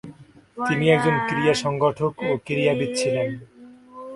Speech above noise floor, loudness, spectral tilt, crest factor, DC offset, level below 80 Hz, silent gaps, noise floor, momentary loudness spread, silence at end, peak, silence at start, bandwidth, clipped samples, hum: 24 dB; -22 LUFS; -5.5 dB/octave; 20 dB; under 0.1%; -58 dBFS; none; -46 dBFS; 11 LU; 0 s; -4 dBFS; 0.05 s; 11.5 kHz; under 0.1%; none